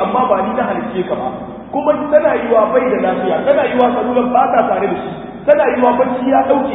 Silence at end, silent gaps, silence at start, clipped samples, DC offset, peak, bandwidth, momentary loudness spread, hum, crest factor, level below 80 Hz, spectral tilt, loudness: 0 s; none; 0 s; under 0.1%; under 0.1%; 0 dBFS; 3.9 kHz; 8 LU; none; 14 dB; -48 dBFS; -9.5 dB/octave; -14 LUFS